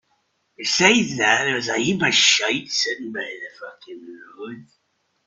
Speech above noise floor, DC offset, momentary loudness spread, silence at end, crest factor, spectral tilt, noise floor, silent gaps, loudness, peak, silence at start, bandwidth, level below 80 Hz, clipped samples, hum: 47 dB; under 0.1%; 23 LU; 0.65 s; 22 dB; -2 dB/octave; -68 dBFS; none; -18 LUFS; 0 dBFS; 0.6 s; 8.4 kHz; -62 dBFS; under 0.1%; none